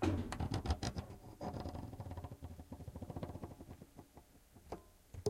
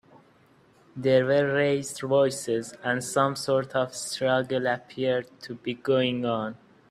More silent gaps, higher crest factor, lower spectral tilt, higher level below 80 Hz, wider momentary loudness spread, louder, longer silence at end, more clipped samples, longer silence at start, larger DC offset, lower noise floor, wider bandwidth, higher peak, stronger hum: neither; about the same, 22 dB vs 18 dB; first, -6 dB/octave vs -4.5 dB/octave; first, -52 dBFS vs -68 dBFS; first, 19 LU vs 8 LU; second, -46 LUFS vs -26 LUFS; second, 0 s vs 0.35 s; neither; second, 0 s vs 0.95 s; neither; first, -63 dBFS vs -59 dBFS; about the same, 16 kHz vs 15 kHz; second, -24 dBFS vs -8 dBFS; neither